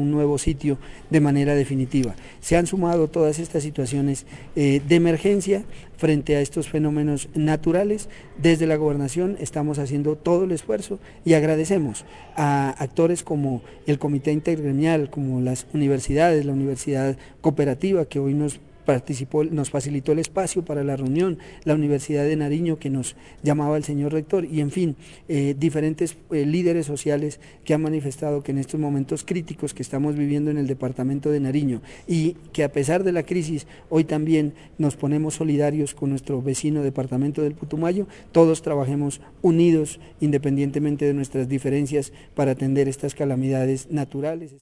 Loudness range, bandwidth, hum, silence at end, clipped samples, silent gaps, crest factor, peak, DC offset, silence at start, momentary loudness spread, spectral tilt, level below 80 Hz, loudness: 3 LU; 11.5 kHz; none; 0.05 s; under 0.1%; none; 18 dB; -4 dBFS; 0.1%; 0 s; 8 LU; -6.5 dB/octave; -46 dBFS; -23 LUFS